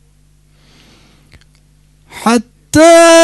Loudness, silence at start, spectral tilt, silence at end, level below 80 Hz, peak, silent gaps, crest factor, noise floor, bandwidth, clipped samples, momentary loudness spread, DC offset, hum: -9 LUFS; 2.15 s; -3 dB/octave; 0 s; -44 dBFS; 0 dBFS; none; 12 dB; -49 dBFS; 12.5 kHz; 1%; 12 LU; under 0.1%; 50 Hz at -50 dBFS